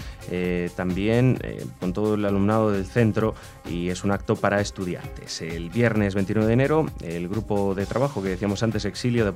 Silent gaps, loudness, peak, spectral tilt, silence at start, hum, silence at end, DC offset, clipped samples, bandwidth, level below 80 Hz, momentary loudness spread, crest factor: none; -24 LUFS; -4 dBFS; -6.5 dB/octave; 0 s; none; 0 s; under 0.1%; under 0.1%; 15.5 kHz; -42 dBFS; 10 LU; 20 dB